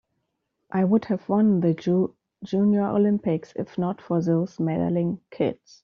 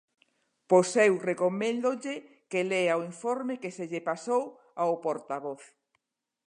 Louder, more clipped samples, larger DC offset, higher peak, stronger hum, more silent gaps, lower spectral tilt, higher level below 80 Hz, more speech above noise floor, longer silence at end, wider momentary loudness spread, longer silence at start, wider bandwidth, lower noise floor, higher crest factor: first, -24 LUFS vs -29 LUFS; neither; neither; about the same, -8 dBFS vs -8 dBFS; neither; neither; first, -9 dB/octave vs -5 dB/octave; first, -64 dBFS vs -84 dBFS; about the same, 54 dB vs 52 dB; second, 0.3 s vs 0.8 s; second, 8 LU vs 12 LU; about the same, 0.75 s vs 0.7 s; second, 6.8 kHz vs 11 kHz; second, -77 dBFS vs -81 dBFS; second, 16 dB vs 22 dB